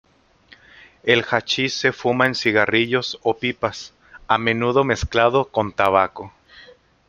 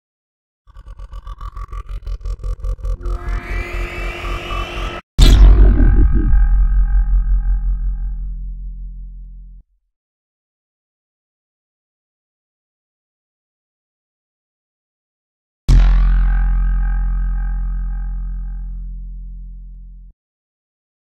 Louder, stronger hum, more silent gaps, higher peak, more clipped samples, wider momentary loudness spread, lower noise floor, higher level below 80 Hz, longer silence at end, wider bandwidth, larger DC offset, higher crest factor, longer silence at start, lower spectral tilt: about the same, -19 LUFS vs -19 LUFS; neither; second, none vs 5.03-5.18 s, 9.96-15.68 s; about the same, 0 dBFS vs 0 dBFS; neither; second, 9 LU vs 21 LU; first, -52 dBFS vs -42 dBFS; second, -46 dBFS vs -18 dBFS; second, 0.45 s vs 0.95 s; first, 13 kHz vs 8.4 kHz; neither; about the same, 20 dB vs 16 dB; first, 1.05 s vs 0.75 s; second, -4.5 dB/octave vs -6 dB/octave